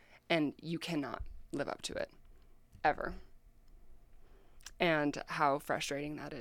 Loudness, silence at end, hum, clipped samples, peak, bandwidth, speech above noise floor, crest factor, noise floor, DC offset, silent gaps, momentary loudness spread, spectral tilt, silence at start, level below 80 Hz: -36 LUFS; 0 s; none; under 0.1%; -16 dBFS; 17 kHz; 23 dB; 22 dB; -58 dBFS; under 0.1%; none; 12 LU; -4.5 dB/octave; 0.1 s; -56 dBFS